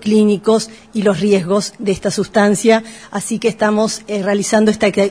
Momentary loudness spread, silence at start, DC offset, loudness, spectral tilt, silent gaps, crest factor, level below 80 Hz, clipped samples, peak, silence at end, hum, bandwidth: 7 LU; 0 s; 0.1%; -15 LUFS; -5 dB/octave; none; 14 dB; -50 dBFS; under 0.1%; 0 dBFS; 0 s; none; 11 kHz